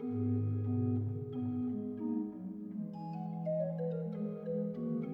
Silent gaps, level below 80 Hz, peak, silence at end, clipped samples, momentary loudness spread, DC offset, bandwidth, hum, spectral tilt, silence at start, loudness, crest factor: none; -74 dBFS; -24 dBFS; 0 s; under 0.1%; 8 LU; under 0.1%; 4.9 kHz; none; -12.5 dB/octave; 0 s; -38 LUFS; 12 dB